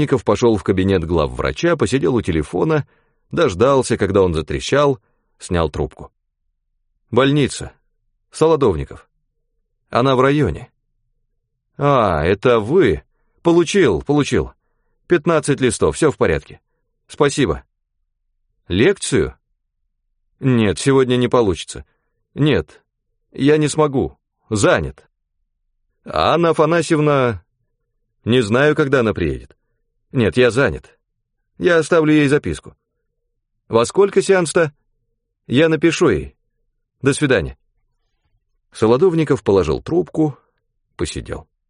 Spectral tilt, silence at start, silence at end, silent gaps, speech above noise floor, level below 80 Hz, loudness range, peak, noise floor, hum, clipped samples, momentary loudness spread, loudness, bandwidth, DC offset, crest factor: -6 dB/octave; 0 s; 0.25 s; none; 56 dB; -40 dBFS; 3 LU; -2 dBFS; -72 dBFS; none; under 0.1%; 12 LU; -17 LUFS; 10.5 kHz; under 0.1%; 16 dB